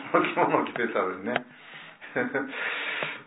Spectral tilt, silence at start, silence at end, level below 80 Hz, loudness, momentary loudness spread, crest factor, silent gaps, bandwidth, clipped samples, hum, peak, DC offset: -8.5 dB/octave; 0 s; 0.05 s; -76 dBFS; -28 LUFS; 19 LU; 24 dB; none; 4 kHz; under 0.1%; none; -4 dBFS; under 0.1%